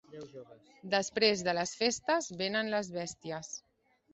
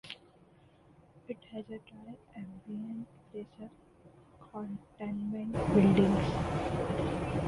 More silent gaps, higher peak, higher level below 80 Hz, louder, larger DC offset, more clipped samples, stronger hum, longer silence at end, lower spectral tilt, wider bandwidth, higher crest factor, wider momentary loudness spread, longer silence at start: neither; about the same, -12 dBFS vs -12 dBFS; second, -72 dBFS vs -50 dBFS; about the same, -32 LUFS vs -32 LUFS; neither; neither; neither; first, 0.55 s vs 0 s; second, -3 dB/octave vs -8 dB/octave; second, 8.4 kHz vs 11.5 kHz; about the same, 22 dB vs 22 dB; second, 20 LU vs 23 LU; about the same, 0.1 s vs 0.05 s